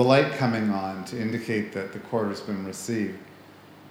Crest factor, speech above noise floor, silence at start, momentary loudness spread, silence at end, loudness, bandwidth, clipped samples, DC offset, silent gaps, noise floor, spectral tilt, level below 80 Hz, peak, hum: 20 dB; 23 dB; 0 s; 10 LU; 0 s; -27 LUFS; over 20 kHz; under 0.1%; under 0.1%; none; -49 dBFS; -6 dB/octave; -70 dBFS; -6 dBFS; none